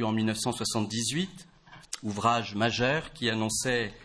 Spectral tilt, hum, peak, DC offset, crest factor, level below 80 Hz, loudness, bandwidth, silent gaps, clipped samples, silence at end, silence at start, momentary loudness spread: -4 dB/octave; none; -12 dBFS; under 0.1%; 18 dB; -56 dBFS; -29 LUFS; 11 kHz; none; under 0.1%; 0 s; 0 s; 8 LU